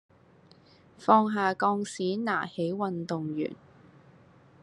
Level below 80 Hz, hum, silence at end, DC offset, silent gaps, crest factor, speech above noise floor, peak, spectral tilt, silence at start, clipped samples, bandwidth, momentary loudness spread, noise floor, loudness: -76 dBFS; none; 1.1 s; under 0.1%; none; 24 dB; 30 dB; -6 dBFS; -6 dB/octave; 1 s; under 0.1%; 11 kHz; 11 LU; -58 dBFS; -28 LUFS